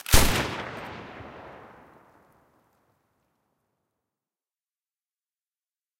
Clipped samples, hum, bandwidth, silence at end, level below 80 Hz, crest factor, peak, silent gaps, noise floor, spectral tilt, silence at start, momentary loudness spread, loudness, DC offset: under 0.1%; none; 16 kHz; 4.5 s; -36 dBFS; 28 dB; -2 dBFS; none; under -90 dBFS; -3 dB/octave; 0.1 s; 26 LU; -26 LUFS; under 0.1%